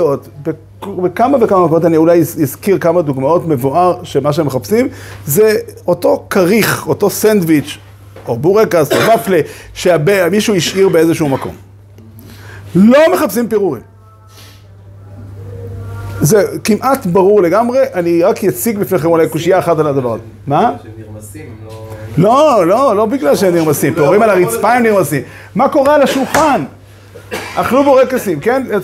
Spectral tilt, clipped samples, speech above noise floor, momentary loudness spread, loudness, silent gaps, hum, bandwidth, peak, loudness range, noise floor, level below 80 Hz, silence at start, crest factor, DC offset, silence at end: -5.5 dB/octave; under 0.1%; 28 dB; 17 LU; -12 LUFS; none; none; 16.5 kHz; 0 dBFS; 3 LU; -39 dBFS; -44 dBFS; 0 s; 12 dB; under 0.1%; 0 s